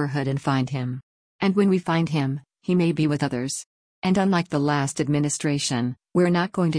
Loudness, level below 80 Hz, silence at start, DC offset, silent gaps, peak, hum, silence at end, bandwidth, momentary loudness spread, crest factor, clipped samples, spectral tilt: -23 LUFS; -58 dBFS; 0 s; under 0.1%; 1.03-1.39 s, 3.66-4.02 s; -8 dBFS; none; 0 s; 10.5 kHz; 8 LU; 14 dB; under 0.1%; -5.5 dB/octave